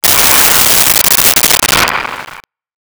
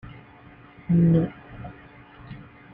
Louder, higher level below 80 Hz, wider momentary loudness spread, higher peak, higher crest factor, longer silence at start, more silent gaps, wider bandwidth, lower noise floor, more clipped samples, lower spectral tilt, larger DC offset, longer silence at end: first, -5 LUFS vs -22 LUFS; first, -34 dBFS vs -50 dBFS; second, 12 LU vs 24 LU; first, 0 dBFS vs -10 dBFS; second, 10 dB vs 16 dB; about the same, 0.05 s vs 0.05 s; neither; first, over 20 kHz vs 3.5 kHz; second, -34 dBFS vs -49 dBFS; neither; second, 0 dB/octave vs -12.5 dB/octave; neither; first, 0.45 s vs 0.3 s